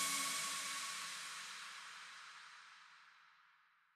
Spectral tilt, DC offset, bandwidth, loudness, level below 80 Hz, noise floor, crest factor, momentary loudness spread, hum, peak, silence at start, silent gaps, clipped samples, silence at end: 1.5 dB/octave; under 0.1%; 15.5 kHz; -43 LUFS; under -90 dBFS; -73 dBFS; 22 dB; 22 LU; none; -26 dBFS; 0 s; none; under 0.1%; 0.45 s